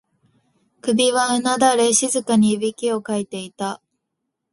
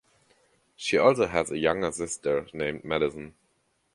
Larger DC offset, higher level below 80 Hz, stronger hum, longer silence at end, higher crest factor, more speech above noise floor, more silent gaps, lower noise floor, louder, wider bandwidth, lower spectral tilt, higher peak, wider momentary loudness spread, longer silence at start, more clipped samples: neither; second, -66 dBFS vs -56 dBFS; neither; about the same, 0.75 s vs 0.65 s; about the same, 18 dB vs 22 dB; first, 59 dB vs 45 dB; neither; first, -78 dBFS vs -71 dBFS; first, -19 LUFS vs -27 LUFS; about the same, 11.5 kHz vs 11.5 kHz; about the same, -3 dB/octave vs -4 dB/octave; first, -2 dBFS vs -6 dBFS; about the same, 12 LU vs 11 LU; about the same, 0.85 s vs 0.8 s; neither